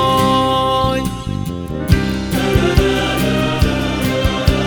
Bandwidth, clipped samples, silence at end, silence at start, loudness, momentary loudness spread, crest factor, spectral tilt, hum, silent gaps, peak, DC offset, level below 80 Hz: over 20 kHz; under 0.1%; 0 s; 0 s; -16 LUFS; 9 LU; 16 dB; -5.5 dB/octave; none; none; 0 dBFS; under 0.1%; -24 dBFS